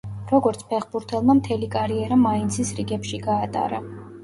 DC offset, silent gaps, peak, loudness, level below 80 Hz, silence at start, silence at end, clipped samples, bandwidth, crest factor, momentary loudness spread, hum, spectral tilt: under 0.1%; none; -6 dBFS; -23 LUFS; -48 dBFS; 0.05 s; 0 s; under 0.1%; 11.5 kHz; 16 dB; 9 LU; none; -6 dB/octave